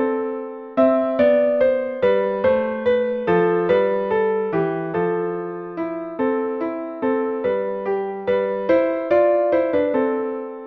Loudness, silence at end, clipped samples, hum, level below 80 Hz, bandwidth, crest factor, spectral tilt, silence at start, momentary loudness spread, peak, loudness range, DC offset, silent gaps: -20 LUFS; 0 s; under 0.1%; none; -58 dBFS; 5 kHz; 16 dB; -9 dB/octave; 0 s; 9 LU; -4 dBFS; 5 LU; under 0.1%; none